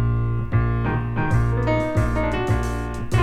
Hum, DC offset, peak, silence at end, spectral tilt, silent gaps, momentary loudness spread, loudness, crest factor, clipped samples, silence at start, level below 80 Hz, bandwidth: none; under 0.1%; -6 dBFS; 0 s; -7.5 dB/octave; none; 3 LU; -22 LUFS; 14 dB; under 0.1%; 0 s; -28 dBFS; 10.5 kHz